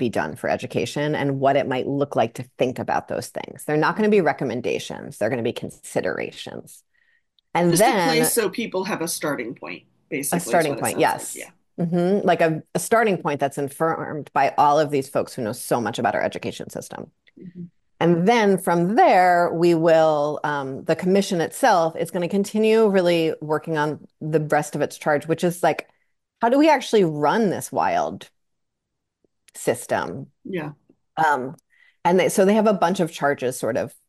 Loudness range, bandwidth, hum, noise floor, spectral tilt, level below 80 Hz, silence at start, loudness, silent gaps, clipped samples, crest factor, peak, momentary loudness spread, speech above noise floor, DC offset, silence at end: 7 LU; 13 kHz; none; -80 dBFS; -5 dB/octave; -66 dBFS; 0 s; -21 LUFS; none; under 0.1%; 14 dB; -6 dBFS; 14 LU; 59 dB; under 0.1%; 0.2 s